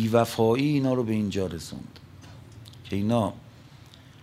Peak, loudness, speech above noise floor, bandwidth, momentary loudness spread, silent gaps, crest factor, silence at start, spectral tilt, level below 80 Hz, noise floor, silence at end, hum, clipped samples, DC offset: -6 dBFS; -26 LUFS; 24 dB; 16 kHz; 24 LU; none; 20 dB; 0 s; -7 dB/octave; -58 dBFS; -49 dBFS; 0.45 s; none; under 0.1%; under 0.1%